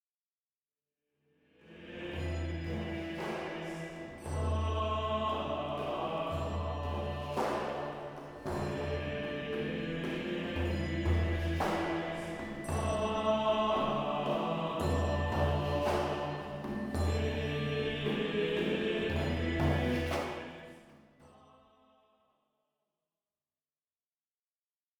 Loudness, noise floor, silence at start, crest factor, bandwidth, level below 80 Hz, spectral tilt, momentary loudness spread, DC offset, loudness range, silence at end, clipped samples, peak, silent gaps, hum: -34 LUFS; under -90 dBFS; 1.65 s; 18 dB; 15 kHz; -46 dBFS; -6.5 dB/octave; 9 LU; under 0.1%; 8 LU; 3.7 s; under 0.1%; -18 dBFS; none; none